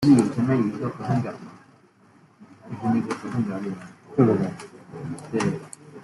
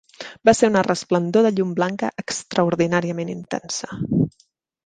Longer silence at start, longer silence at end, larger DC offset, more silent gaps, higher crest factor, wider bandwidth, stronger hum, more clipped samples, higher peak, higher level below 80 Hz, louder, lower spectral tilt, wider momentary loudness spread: second, 0 s vs 0.2 s; second, 0 s vs 0.55 s; neither; neither; about the same, 20 dB vs 18 dB; first, 12 kHz vs 10 kHz; neither; neither; about the same, -4 dBFS vs -2 dBFS; second, -60 dBFS vs -54 dBFS; second, -25 LUFS vs -21 LUFS; first, -7.5 dB/octave vs -5.5 dB/octave; first, 20 LU vs 11 LU